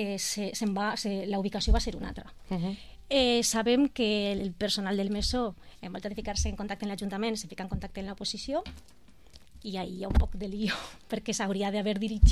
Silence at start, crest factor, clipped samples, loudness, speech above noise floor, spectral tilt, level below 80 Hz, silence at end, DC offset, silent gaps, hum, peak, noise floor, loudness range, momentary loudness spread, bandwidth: 0 s; 22 dB; under 0.1%; -31 LUFS; 27 dB; -4.5 dB/octave; -36 dBFS; 0 s; 0.2%; none; none; -8 dBFS; -56 dBFS; 7 LU; 12 LU; 15 kHz